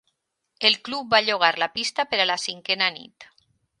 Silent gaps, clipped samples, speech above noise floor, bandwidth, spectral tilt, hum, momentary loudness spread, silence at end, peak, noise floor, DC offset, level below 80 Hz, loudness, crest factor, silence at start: none; under 0.1%; 51 dB; 11.5 kHz; -1.5 dB/octave; none; 5 LU; 0.55 s; -2 dBFS; -74 dBFS; under 0.1%; -70 dBFS; -22 LUFS; 24 dB; 0.6 s